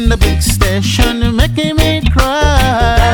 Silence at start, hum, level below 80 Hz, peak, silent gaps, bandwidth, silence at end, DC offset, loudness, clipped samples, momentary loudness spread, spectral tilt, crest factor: 0 s; none; -14 dBFS; 0 dBFS; none; 20 kHz; 0 s; under 0.1%; -12 LUFS; 0.3%; 2 LU; -5 dB/octave; 10 dB